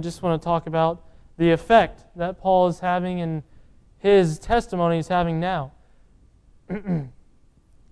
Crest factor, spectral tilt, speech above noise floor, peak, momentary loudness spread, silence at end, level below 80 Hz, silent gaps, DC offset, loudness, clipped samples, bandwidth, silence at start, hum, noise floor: 20 dB; -7 dB/octave; 34 dB; -4 dBFS; 13 LU; 0.85 s; -44 dBFS; none; under 0.1%; -22 LUFS; under 0.1%; 11 kHz; 0 s; none; -55 dBFS